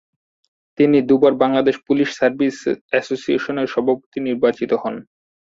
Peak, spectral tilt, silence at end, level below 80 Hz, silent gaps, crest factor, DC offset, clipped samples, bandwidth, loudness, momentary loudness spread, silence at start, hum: -2 dBFS; -6 dB/octave; 0.4 s; -60 dBFS; 2.81-2.89 s, 4.06-4.12 s; 16 dB; under 0.1%; under 0.1%; 7.8 kHz; -18 LUFS; 8 LU; 0.8 s; none